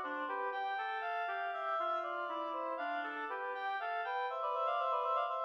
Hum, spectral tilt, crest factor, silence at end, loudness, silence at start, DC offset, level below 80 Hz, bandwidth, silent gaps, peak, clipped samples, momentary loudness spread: none; -2 dB/octave; 14 dB; 0 s; -38 LUFS; 0 s; under 0.1%; under -90 dBFS; 7 kHz; none; -24 dBFS; under 0.1%; 5 LU